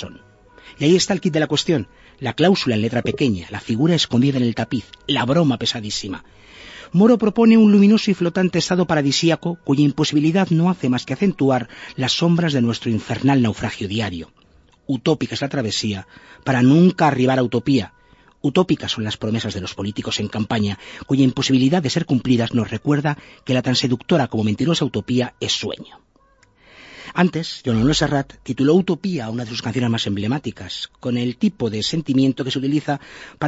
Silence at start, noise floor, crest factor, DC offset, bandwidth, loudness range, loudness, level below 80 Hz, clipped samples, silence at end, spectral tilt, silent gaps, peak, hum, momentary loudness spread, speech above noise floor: 0 s; -56 dBFS; 16 dB; under 0.1%; 8 kHz; 6 LU; -19 LUFS; -50 dBFS; under 0.1%; 0 s; -5.5 dB/octave; none; -4 dBFS; none; 11 LU; 38 dB